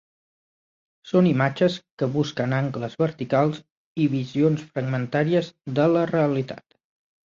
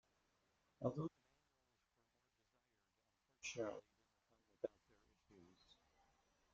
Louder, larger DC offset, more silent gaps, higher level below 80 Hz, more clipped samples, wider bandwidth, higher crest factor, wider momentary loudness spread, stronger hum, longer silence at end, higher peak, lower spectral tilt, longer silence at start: first, -23 LUFS vs -50 LUFS; neither; first, 1.91-1.97 s, 3.70-3.95 s vs none; first, -62 dBFS vs -86 dBFS; neither; about the same, 7.4 kHz vs 7.4 kHz; second, 18 dB vs 26 dB; about the same, 8 LU vs 9 LU; neither; about the same, 0.75 s vs 0.8 s; first, -6 dBFS vs -30 dBFS; first, -8 dB/octave vs -5.5 dB/octave; first, 1.05 s vs 0.8 s